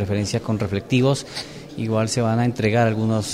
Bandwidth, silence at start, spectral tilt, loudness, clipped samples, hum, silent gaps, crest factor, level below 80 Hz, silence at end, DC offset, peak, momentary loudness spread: 13.5 kHz; 0 s; -6 dB/octave; -21 LUFS; under 0.1%; none; none; 14 dB; -50 dBFS; 0 s; under 0.1%; -6 dBFS; 11 LU